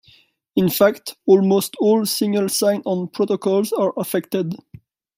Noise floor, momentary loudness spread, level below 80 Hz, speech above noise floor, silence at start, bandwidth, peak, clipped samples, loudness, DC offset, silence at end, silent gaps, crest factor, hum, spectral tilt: -55 dBFS; 9 LU; -62 dBFS; 36 dB; 0.55 s; 16 kHz; -2 dBFS; under 0.1%; -19 LUFS; under 0.1%; 0.6 s; none; 18 dB; none; -5 dB/octave